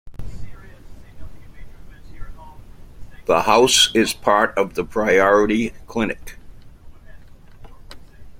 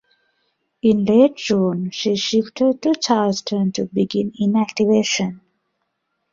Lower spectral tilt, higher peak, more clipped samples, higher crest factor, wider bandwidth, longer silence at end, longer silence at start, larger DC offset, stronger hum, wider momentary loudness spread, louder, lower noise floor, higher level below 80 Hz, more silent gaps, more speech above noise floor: second, -2.5 dB/octave vs -5 dB/octave; about the same, -2 dBFS vs -2 dBFS; neither; about the same, 20 dB vs 18 dB; first, 16.5 kHz vs 7.6 kHz; second, 0 s vs 0.95 s; second, 0.05 s vs 0.85 s; neither; neither; first, 21 LU vs 7 LU; about the same, -17 LUFS vs -19 LUFS; second, -40 dBFS vs -73 dBFS; first, -40 dBFS vs -60 dBFS; neither; second, 23 dB vs 55 dB